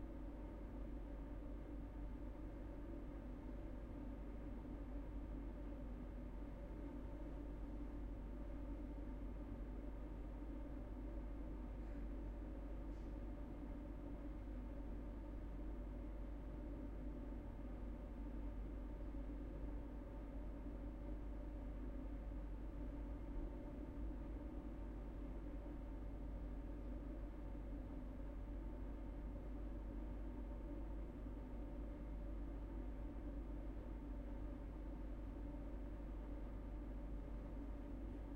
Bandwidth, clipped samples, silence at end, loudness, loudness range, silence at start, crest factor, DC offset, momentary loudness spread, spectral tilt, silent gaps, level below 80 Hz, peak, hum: 4.2 kHz; under 0.1%; 0 s; -52 LUFS; 1 LU; 0 s; 12 dB; under 0.1%; 2 LU; -9 dB/octave; none; -50 dBFS; -38 dBFS; none